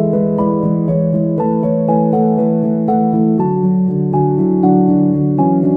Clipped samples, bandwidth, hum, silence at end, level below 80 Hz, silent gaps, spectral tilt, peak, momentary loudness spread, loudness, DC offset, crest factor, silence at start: under 0.1%; 2.7 kHz; none; 0 s; -44 dBFS; none; -13.5 dB/octave; 0 dBFS; 3 LU; -14 LUFS; under 0.1%; 12 dB; 0 s